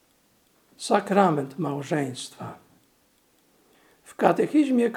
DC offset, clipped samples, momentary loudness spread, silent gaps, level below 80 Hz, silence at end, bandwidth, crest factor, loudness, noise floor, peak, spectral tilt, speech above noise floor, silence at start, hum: under 0.1%; under 0.1%; 17 LU; none; -76 dBFS; 0 s; 15.5 kHz; 24 dB; -24 LUFS; -64 dBFS; -2 dBFS; -6 dB/octave; 41 dB; 0.8 s; none